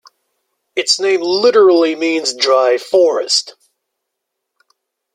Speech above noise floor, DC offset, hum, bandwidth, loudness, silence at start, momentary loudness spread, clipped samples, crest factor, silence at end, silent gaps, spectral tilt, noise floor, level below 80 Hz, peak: 64 dB; under 0.1%; none; 12 kHz; -13 LUFS; 0.75 s; 7 LU; under 0.1%; 16 dB; 1.65 s; none; -1.5 dB/octave; -77 dBFS; -66 dBFS; 0 dBFS